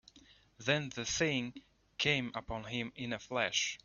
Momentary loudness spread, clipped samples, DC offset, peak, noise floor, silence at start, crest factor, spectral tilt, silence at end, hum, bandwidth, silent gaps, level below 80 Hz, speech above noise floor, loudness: 9 LU; under 0.1%; under 0.1%; -16 dBFS; -63 dBFS; 0.15 s; 22 dB; -2.5 dB/octave; 0.1 s; none; 7.2 kHz; none; -62 dBFS; 27 dB; -35 LUFS